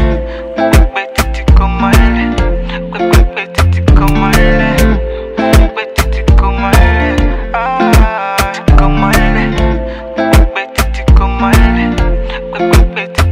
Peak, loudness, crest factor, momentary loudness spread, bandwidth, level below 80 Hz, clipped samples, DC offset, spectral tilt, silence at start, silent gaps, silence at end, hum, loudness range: 0 dBFS; -11 LUFS; 8 dB; 7 LU; 16.5 kHz; -12 dBFS; 1%; under 0.1%; -6 dB/octave; 0 s; none; 0 s; none; 1 LU